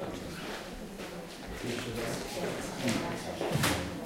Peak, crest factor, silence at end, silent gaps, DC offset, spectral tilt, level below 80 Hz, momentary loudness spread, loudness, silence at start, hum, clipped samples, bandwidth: -16 dBFS; 20 dB; 0 s; none; under 0.1%; -4 dB/octave; -52 dBFS; 12 LU; -35 LUFS; 0 s; none; under 0.1%; 16 kHz